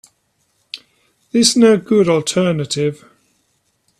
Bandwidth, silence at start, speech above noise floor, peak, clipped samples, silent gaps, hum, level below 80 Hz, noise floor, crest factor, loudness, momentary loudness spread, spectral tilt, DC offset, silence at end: 14 kHz; 0.75 s; 50 dB; 0 dBFS; under 0.1%; none; none; -58 dBFS; -64 dBFS; 18 dB; -14 LUFS; 22 LU; -4.5 dB/octave; under 0.1%; 1.05 s